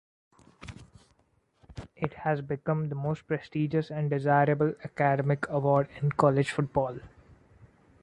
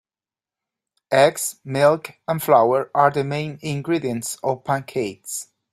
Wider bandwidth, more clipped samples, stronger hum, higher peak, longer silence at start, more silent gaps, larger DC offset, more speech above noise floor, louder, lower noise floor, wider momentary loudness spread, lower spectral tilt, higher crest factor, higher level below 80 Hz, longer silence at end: second, 10.5 kHz vs 16 kHz; neither; neither; second, -8 dBFS vs -2 dBFS; second, 0.6 s vs 1.1 s; neither; neither; second, 42 dB vs over 70 dB; second, -28 LUFS vs -21 LUFS; second, -69 dBFS vs under -90 dBFS; first, 22 LU vs 11 LU; first, -8 dB/octave vs -4.5 dB/octave; about the same, 22 dB vs 20 dB; about the same, -58 dBFS vs -62 dBFS; first, 0.95 s vs 0.3 s